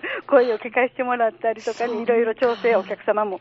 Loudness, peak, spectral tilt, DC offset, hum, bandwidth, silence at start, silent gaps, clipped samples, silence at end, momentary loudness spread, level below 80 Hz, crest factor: -21 LUFS; -4 dBFS; -2.5 dB/octave; under 0.1%; none; 7.8 kHz; 0.05 s; none; under 0.1%; 0.05 s; 7 LU; -70 dBFS; 18 dB